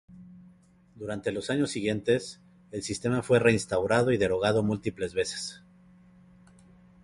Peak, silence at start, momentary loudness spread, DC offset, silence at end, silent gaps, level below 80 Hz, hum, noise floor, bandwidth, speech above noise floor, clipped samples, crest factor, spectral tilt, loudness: -8 dBFS; 0.1 s; 14 LU; under 0.1%; 1.45 s; none; -56 dBFS; none; -58 dBFS; 11.5 kHz; 31 dB; under 0.1%; 20 dB; -5 dB/octave; -28 LUFS